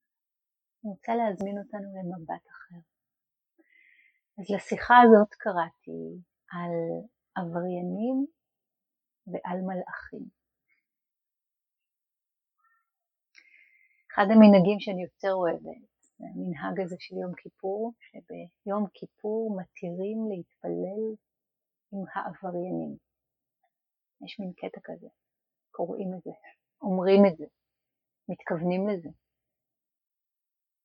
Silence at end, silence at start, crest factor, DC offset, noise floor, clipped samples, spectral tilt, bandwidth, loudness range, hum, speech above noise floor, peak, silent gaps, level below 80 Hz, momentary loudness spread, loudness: 1.7 s; 0.85 s; 26 dB; under 0.1%; -89 dBFS; under 0.1%; -8 dB/octave; 8 kHz; 16 LU; none; 62 dB; -4 dBFS; none; -70 dBFS; 23 LU; -27 LUFS